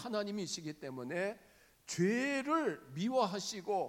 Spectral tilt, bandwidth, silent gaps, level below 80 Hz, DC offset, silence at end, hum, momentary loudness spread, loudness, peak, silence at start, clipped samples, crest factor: -4.5 dB/octave; 17 kHz; none; -78 dBFS; under 0.1%; 0 s; none; 11 LU; -37 LUFS; -20 dBFS; 0 s; under 0.1%; 18 dB